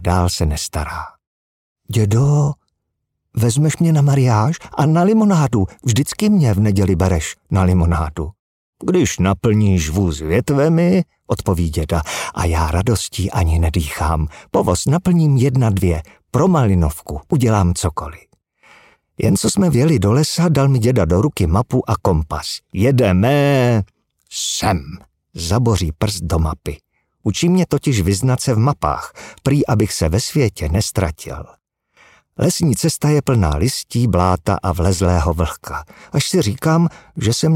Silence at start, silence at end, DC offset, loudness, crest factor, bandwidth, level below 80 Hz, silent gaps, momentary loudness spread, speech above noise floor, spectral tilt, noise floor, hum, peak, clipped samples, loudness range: 0 s; 0 s; under 0.1%; -17 LUFS; 16 dB; 16.5 kHz; -30 dBFS; 1.27-1.76 s, 8.39-8.73 s; 10 LU; 59 dB; -6 dB/octave; -75 dBFS; none; 0 dBFS; under 0.1%; 4 LU